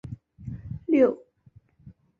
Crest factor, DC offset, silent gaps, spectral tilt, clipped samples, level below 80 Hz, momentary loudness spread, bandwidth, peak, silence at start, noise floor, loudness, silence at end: 20 dB; under 0.1%; none; -9.5 dB/octave; under 0.1%; -52 dBFS; 20 LU; 6.6 kHz; -8 dBFS; 0.05 s; -58 dBFS; -24 LUFS; 0.3 s